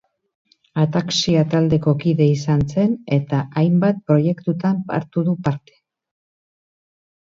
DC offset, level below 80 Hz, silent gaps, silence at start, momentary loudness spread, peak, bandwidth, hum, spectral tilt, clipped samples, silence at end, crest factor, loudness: under 0.1%; -50 dBFS; none; 0.75 s; 6 LU; -2 dBFS; 7.6 kHz; none; -7 dB/octave; under 0.1%; 1.7 s; 16 dB; -19 LUFS